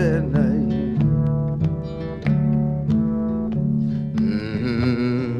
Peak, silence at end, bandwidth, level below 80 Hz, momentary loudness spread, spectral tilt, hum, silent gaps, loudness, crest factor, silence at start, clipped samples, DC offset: -8 dBFS; 0 s; 6.2 kHz; -38 dBFS; 4 LU; -9.5 dB/octave; none; none; -21 LUFS; 14 dB; 0 s; under 0.1%; under 0.1%